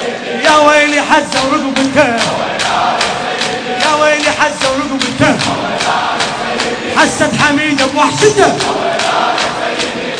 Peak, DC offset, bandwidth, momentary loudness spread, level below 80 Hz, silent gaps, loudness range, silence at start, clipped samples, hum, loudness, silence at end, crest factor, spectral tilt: 0 dBFS; under 0.1%; 11 kHz; 6 LU; -44 dBFS; none; 2 LU; 0 s; 0.4%; none; -11 LUFS; 0 s; 12 dB; -3 dB/octave